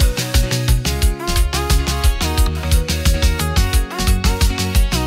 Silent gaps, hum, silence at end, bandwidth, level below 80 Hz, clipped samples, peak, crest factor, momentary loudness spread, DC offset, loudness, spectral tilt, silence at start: none; none; 0 s; 16.5 kHz; -18 dBFS; under 0.1%; -4 dBFS; 12 dB; 2 LU; under 0.1%; -18 LUFS; -4 dB/octave; 0 s